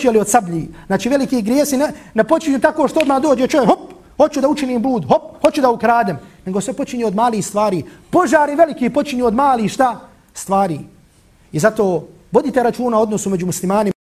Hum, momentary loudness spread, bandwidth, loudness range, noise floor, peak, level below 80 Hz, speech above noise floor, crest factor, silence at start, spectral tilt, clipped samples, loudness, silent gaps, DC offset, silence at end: none; 8 LU; 15.5 kHz; 3 LU; -50 dBFS; 0 dBFS; -48 dBFS; 34 dB; 16 dB; 0 s; -5 dB/octave; under 0.1%; -16 LUFS; none; under 0.1%; 0.1 s